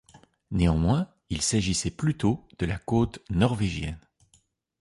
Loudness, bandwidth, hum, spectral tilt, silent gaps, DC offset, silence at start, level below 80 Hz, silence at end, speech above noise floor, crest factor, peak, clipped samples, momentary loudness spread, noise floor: -27 LUFS; 11.5 kHz; none; -5.5 dB/octave; none; under 0.1%; 0.15 s; -40 dBFS; 0.85 s; 40 dB; 18 dB; -10 dBFS; under 0.1%; 9 LU; -66 dBFS